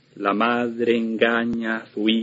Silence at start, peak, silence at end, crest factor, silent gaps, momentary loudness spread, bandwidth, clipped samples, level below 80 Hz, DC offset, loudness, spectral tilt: 0.15 s; -2 dBFS; 0 s; 20 dB; none; 5 LU; 7.6 kHz; under 0.1%; -62 dBFS; under 0.1%; -22 LUFS; -6.5 dB/octave